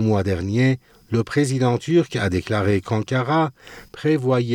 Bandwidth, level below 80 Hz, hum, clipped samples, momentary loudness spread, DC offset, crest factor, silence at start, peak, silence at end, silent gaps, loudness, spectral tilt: 13 kHz; -54 dBFS; none; under 0.1%; 6 LU; under 0.1%; 14 dB; 0 s; -6 dBFS; 0 s; none; -21 LUFS; -7 dB/octave